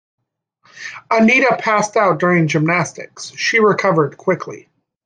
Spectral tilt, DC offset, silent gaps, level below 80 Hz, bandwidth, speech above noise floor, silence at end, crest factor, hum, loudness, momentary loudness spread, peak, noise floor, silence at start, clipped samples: -5 dB/octave; under 0.1%; none; -62 dBFS; 9.6 kHz; 44 dB; 0.45 s; 16 dB; none; -15 LUFS; 18 LU; -2 dBFS; -59 dBFS; 0.75 s; under 0.1%